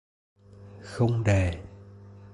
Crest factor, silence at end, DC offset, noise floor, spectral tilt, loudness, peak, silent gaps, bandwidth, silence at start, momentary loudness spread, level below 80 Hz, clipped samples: 18 dB; 0.05 s; under 0.1%; -48 dBFS; -7 dB/octave; -26 LUFS; -12 dBFS; none; 11 kHz; 0.6 s; 25 LU; -42 dBFS; under 0.1%